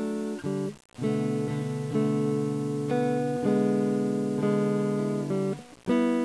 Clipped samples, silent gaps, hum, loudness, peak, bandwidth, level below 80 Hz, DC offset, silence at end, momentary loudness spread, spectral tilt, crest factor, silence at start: under 0.1%; none; 60 Hz at -60 dBFS; -28 LUFS; -12 dBFS; 11 kHz; -66 dBFS; under 0.1%; 0 s; 7 LU; -7.5 dB/octave; 16 dB; 0 s